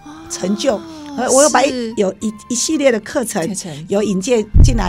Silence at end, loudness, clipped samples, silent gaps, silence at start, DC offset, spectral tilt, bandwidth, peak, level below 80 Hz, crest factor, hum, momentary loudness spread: 0 s; -16 LUFS; under 0.1%; none; 0.05 s; under 0.1%; -4.5 dB/octave; 16 kHz; 0 dBFS; -22 dBFS; 16 dB; none; 12 LU